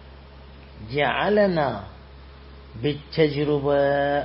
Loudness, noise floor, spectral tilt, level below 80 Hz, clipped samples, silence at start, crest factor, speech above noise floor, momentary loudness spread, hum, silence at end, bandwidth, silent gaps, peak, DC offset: -22 LUFS; -44 dBFS; -11 dB/octave; -46 dBFS; under 0.1%; 0 s; 18 dB; 22 dB; 17 LU; none; 0 s; 5.8 kHz; none; -6 dBFS; under 0.1%